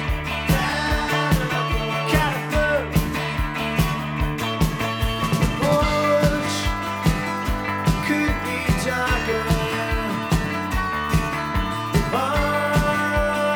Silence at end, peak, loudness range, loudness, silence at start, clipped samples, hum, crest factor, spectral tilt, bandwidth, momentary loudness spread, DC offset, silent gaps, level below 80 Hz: 0 s; -4 dBFS; 1 LU; -22 LUFS; 0 s; under 0.1%; none; 18 dB; -5.5 dB/octave; over 20 kHz; 5 LU; under 0.1%; none; -30 dBFS